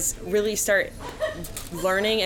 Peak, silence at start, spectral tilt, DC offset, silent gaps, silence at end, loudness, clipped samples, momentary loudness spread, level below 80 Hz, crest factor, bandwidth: -10 dBFS; 0 s; -2 dB/octave; under 0.1%; none; 0 s; -25 LUFS; under 0.1%; 11 LU; -44 dBFS; 14 dB; 18 kHz